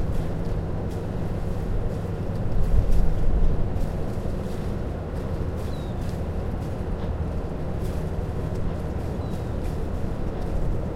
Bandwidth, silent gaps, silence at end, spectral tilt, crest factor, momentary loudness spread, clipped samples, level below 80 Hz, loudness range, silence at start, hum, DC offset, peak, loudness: 12 kHz; none; 0 s; -8.5 dB/octave; 18 dB; 4 LU; under 0.1%; -28 dBFS; 2 LU; 0 s; none; under 0.1%; -6 dBFS; -29 LUFS